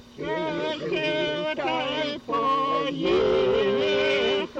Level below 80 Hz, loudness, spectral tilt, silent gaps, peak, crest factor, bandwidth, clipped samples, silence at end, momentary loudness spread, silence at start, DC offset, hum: -54 dBFS; -24 LUFS; -5 dB/octave; none; -14 dBFS; 12 dB; 8.2 kHz; under 0.1%; 0 s; 6 LU; 0 s; under 0.1%; none